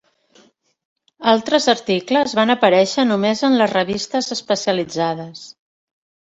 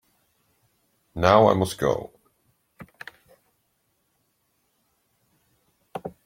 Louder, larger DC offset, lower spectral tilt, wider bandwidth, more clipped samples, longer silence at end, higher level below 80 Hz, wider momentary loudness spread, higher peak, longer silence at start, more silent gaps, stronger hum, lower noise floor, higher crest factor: first, -17 LUFS vs -21 LUFS; neither; second, -4 dB/octave vs -6 dB/octave; second, 8 kHz vs 16.5 kHz; neither; first, 0.8 s vs 0.15 s; about the same, -60 dBFS vs -56 dBFS; second, 8 LU vs 26 LU; about the same, 0 dBFS vs -2 dBFS; about the same, 1.2 s vs 1.15 s; neither; neither; second, -55 dBFS vs -72 dBFS; second, 18 dB vs 26 dB